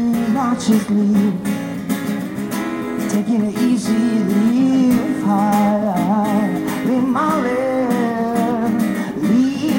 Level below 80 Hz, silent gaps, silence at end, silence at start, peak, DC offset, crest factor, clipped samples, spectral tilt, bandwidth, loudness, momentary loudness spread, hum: -52 dBFS; none; 0 s; 0 s; -4 dBFS; under 0.1%; 12 dB; under 0.1%; -6.5 dB/octave; 17 kHz; -17 LUFS; 7 LU; none